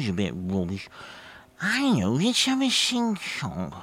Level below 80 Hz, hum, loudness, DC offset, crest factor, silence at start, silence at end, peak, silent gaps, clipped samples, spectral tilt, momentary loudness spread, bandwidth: -56 dBFS; none; -25 LUFS; under 0.1%; 18 dB; 0 s; 0 s; -8 dBFS; none; under 0.1%; -4 dB/octave; 18 LU; 16 kHz